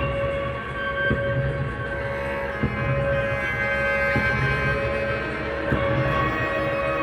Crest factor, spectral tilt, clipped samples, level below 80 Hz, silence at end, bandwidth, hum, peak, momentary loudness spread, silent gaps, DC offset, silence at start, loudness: 16 dB; -7 dB/octave; under 0.1%; -36 dBFS; 0 s; 12 kHz; none; -8 dBFS; 6 LU; none; under 0.1%; 0 s; -24 LUFS